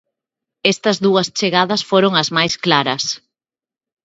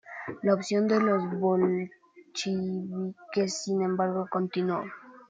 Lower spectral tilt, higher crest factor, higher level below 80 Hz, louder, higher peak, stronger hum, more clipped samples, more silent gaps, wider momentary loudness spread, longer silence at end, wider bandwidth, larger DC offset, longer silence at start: second, -4 dB/octave vs -6 dB/octave; about the same, 18 dB vs 18 dB; first, -62 dBFS vs -74 dBFS; first, -16 LUFS vs -28 LUFS; first, 0 dBFS vs -10 dBFS; neither; neither; neither; second, 5 LU vs 10 LU; first, 0.85 s vs 0.05 s; second, 8 kHz vs 9.2 kHz; neither; first, 0.65 s vs 0.05 s